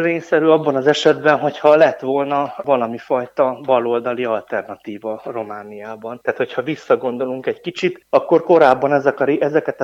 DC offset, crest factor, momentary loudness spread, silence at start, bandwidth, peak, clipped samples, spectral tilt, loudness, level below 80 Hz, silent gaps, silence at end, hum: under 0.1%; 18 dB; 14 LU; 0 s; 8 kHz; 0 dBFS; under 0.1%; -6 dB/octave; -17 LUFS; -66 dBFS; none; 0 s; none